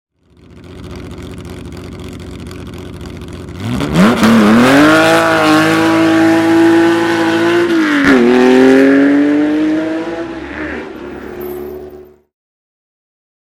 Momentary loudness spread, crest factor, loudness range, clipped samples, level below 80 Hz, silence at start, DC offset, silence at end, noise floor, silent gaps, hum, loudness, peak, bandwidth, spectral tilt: 21 LU; 12 dB; 18 LU; under 0.1%; -38 dBFS; 0.55 s; under 0.1%; 1.4 s; -42 dBFS; none; none; -10 LUFS; 0 dBFS; 16 kHz; -5.5 dB/octave